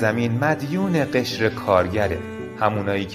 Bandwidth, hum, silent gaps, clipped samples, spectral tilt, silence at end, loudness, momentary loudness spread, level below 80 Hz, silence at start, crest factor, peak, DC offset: 15.5 kHz; none; none; under 0.1%; -6.5 dB/octave; 0 s; -22 LUFS; 5 LU; -48 dBFS; 0 s; 18 dB; -2 dBFS; under 0.1%